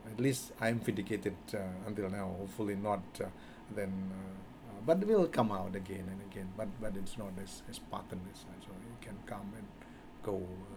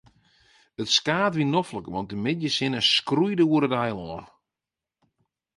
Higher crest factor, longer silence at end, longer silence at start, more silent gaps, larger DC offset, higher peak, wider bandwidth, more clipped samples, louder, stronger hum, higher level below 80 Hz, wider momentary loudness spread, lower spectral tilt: about the same, 22 dB vs 18 dB; second, 0 s vs 1.3 s; second, 0 s vs 0.8 s; neither; neither; second, -16 dBFS vs -8 dBFS; first, over 20 kHz vs 11.5 kHz; neither; second, -38 LUFS vs -24 LUFS; neither; about the same, -58 dBFS vs -60 dBFS; first, 17 LU vs 14 LU; first, -6 dB/octave vs -4.5 dB/octave